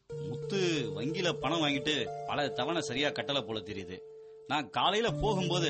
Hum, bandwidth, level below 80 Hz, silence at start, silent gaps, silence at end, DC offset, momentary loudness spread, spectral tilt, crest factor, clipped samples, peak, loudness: none; 8.4 kHz; -56 dBFS; 0.1 s; none; 0 s; under 0.1%; 12 LU; -4.5 dB/octave; 18 dB; under 0.1%; -14 dBFS; -32 LUFS